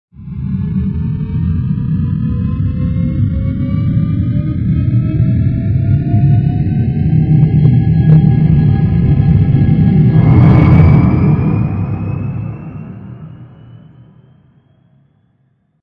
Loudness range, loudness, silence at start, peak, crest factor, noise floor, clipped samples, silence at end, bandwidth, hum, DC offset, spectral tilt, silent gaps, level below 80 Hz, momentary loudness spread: 9 LU; -12 LUFS; 0.2 s; 0 dBFS; 12 dB; -58 dBFS; under 0.1%; 2.05 s; 4.3 kHz; none; under 0.1%; -12 dB/octave; none; -26 dBFS; 12 LU